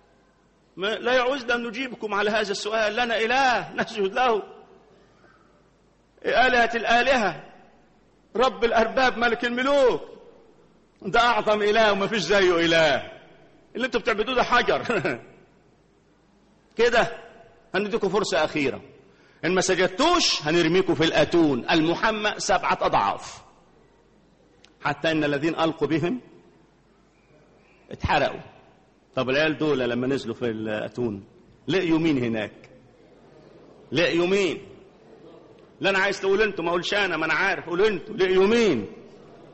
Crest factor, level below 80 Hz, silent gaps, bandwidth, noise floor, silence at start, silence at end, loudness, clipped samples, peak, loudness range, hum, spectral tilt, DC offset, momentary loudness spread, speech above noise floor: 18 dB; -50 dBFS; none; 8.4 kHz; -60 dBFS; 0.75 s; 0.1 s; -23 LUFS; under 0.1%; -8 dBFS; 6 LU; none; -4 dB/octave; under 0.1%; 11 LU; 38 dB